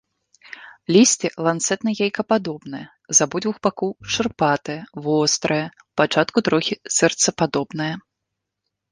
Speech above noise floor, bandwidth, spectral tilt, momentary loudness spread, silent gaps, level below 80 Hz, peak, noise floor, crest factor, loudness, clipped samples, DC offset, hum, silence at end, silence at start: 60 dB; 10.5 kHz; -3 dB/octave; 15 LU; none; -60 dBFS; -2 dBFS; -81 dBFS; 20 dB; -20 LUFS; under 0.1%; under 0.1%; none; 0.9 s; 0.5 s